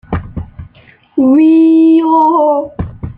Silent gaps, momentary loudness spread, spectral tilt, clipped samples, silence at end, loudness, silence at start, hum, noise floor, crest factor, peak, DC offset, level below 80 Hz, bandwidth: none; 18 LU; -10.5 dB/octave; under 0.1%; 0.05 s; -9 LUFS; 0.1 s; none; -44 dBFS; 10 dB; -2 dBFS; under 0.1%; -34 dBFS; 3.8 kHz